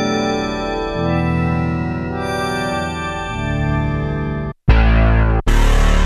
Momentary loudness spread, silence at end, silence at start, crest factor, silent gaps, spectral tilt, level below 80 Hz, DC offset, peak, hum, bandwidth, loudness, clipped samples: 8 LU; 0 s; 0 s; 16 dB; none; -6.5 dB/octave; -18 dBFS; under 0.1%; 0 dBFS; none; 13.5 kHz; -18 LUFS; under 0.1%